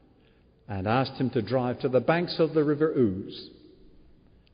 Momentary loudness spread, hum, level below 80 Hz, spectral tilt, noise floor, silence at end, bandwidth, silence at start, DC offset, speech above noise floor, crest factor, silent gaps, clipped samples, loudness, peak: 14 LU; none; -60 dBFS; -5.5 dB/octave; -60 dBFS; 1 s; 5.2 kHz; 0.7 s; under 0.1%; 34 dB; 18 dB; none; under 0.1%; -26 LUFS; -10 dBFS